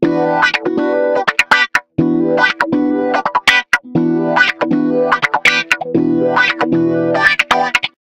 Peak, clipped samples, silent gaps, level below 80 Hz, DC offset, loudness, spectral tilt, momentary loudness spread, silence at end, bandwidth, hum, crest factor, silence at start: 0 dBFS; 0.1%; none; -50 dBFS; under 0.1%; -13 LUFS; -4.5 dB/octave; 4 LU; 0.15 s; 16.5 kHz; none; 14 dB; 0 s